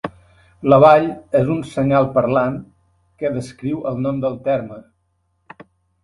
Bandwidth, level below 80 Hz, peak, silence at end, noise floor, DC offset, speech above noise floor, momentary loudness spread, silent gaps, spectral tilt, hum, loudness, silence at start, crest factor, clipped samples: 11.5 kHz; -50 dBFS; 0 dBFS; 1.25 s; -67 dBFS; under 0.1%; 50 dB; 14 LU; none; -8 dB/octave; none; -17 LUFS; 0.05 s; 18 dB; under 0.1%